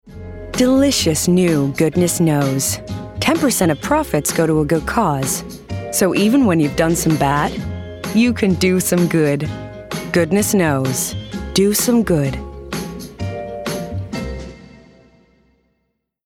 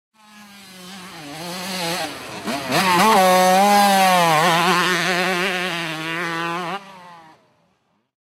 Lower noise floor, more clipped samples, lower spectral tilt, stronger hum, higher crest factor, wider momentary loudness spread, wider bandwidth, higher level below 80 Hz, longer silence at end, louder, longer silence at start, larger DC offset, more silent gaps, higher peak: first, -71 dBFS vs -66 dBFS; neither; first, -5 dB/octave vs -3 dB/octave; neither; about the same, 16 dB vs 16 dB; second, 14 LU vs 18 LU; about the same, 17.5 kHz vs 16 kHz; first, -38 dBFS vs -64 dBFS; first, 1.6 s vs 1.1 s; about the same, -17 LUFS vs -17 LUFS; second, 0.05 s vs 0.35 s; neither; neither; about the same, -2 dBFS vs -4 dBFS